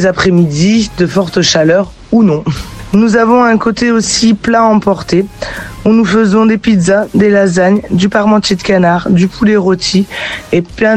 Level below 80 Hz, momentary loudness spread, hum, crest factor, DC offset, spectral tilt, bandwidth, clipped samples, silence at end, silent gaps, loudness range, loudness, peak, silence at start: -36 dBFS; 6 LU; none; 10 dB; 0.1%; -5.5 dB/octave; 11 kHz; under 0.1%; 0 s; none; 1 LU; -10 LUFS; 0 dBFS; 0 s